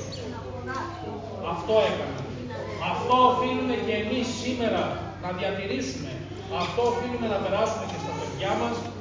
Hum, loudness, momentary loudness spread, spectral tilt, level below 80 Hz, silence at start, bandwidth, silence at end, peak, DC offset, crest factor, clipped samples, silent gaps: none; -27 LUFS; 12 LU; -5 dB/octave; -48 dBFS; 0 s; 7.6 kHz; 0 s; -6 dBFS; under 0.1%; 20 dB; under 0.1%; none